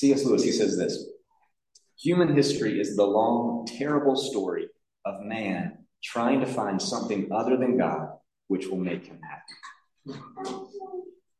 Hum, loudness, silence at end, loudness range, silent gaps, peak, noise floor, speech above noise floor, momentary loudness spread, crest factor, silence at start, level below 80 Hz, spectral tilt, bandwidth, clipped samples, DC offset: none; -26 LUFS; 0.3 s; 5 LU; none; -8 dBFS; -71 dBFS; 45 dB; 20 LU; 18 dB; 0 s; -70 dBFS; -5.5 dB/octave; 12.5 kHz; under 0.1%; under 0.1%